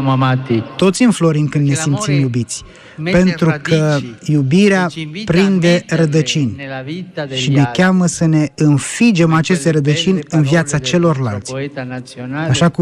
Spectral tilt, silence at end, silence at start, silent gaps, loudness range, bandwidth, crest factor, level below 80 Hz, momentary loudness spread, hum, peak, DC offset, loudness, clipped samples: -5.5 dB/octave; 0 s; 0 s; none; 2 LU; 12 kHz; 12 dB; -46 dBFS; 12 LU; none; -2 dBFS; under 0.1%; -14 LUFS; under 0.1%